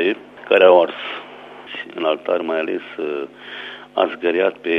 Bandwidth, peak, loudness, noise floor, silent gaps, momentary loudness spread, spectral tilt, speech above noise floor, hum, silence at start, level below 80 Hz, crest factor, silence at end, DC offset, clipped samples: 5.6 kHz; 0 dBFS; -19 LUFS; -38 dBFS; none; 20 LU; -6 dB/octave; 20 dB; 50 Hz at -60 dBFS; 0 s; -72 dBFS; 20 dB; 0 s; under 0.1%; under 0.1%